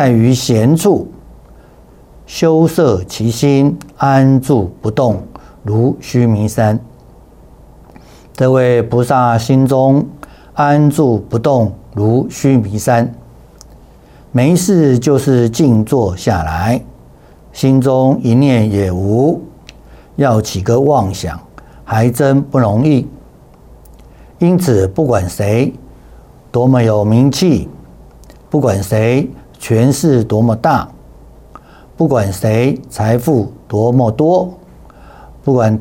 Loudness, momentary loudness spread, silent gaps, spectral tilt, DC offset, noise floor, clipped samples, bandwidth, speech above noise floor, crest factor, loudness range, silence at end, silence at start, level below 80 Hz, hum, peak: -13 LUFS; 8 LU; none; -7 dB/octave; under 0.1%; -41 dBFS; under 0.1%; 17 kHz; 30 dB; 12 dB; 3 LU; 0 s; 0 s; -40 dBFS; none; -2 dBFS